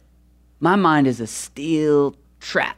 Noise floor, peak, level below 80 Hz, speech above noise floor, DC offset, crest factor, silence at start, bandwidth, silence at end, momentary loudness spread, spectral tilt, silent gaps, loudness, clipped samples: -54 dBFS; -4 dBFS; -54 dBFS; 35 dB; under 0.1%; 16 dB; 0.6 s; 15 kHz; 0.05 s; 12 LU; -5.5 dB/octave; none; -20 LUFS; under 0.1%